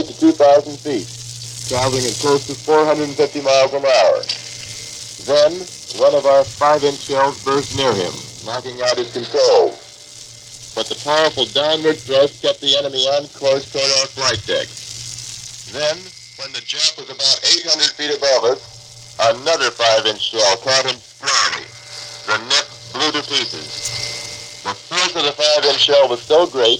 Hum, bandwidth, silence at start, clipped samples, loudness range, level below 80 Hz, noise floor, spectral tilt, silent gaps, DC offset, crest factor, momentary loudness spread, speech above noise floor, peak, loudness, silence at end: none; 15.5 kHz; 0 s; under 0.1%; 3 LU; -54 dBFS; -38 dBFS; -2.5 dB/octave; none; under 0.1%; 18 dB; 15 LU; 22 dB; 0 dBFS; -16 LUFS; 0 s